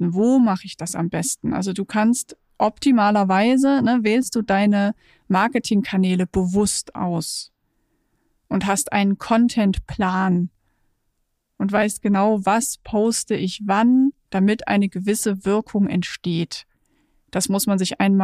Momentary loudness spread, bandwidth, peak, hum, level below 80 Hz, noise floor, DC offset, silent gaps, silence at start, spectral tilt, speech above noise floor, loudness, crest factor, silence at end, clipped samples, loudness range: 8 LU; 15.5 kHz; -6 dBFS; none; -48 dBFS; -72 dBFS; under 0.1%; none; 0 s; -5 dB/octave; 52 dB; -20 LUFS; 14 dB; 0 s; under 0.1%; 4 LU